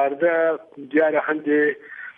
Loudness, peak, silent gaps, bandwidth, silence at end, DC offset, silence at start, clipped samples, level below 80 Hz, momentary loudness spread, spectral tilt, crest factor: -21 LUFS; -8 dBFS; none; 3.7 kHz; 0.05 s; under 0.1%; 0 s; under 0.1%; -78 dBFS; 7 LU; -8.5 dB/octave; 14 dB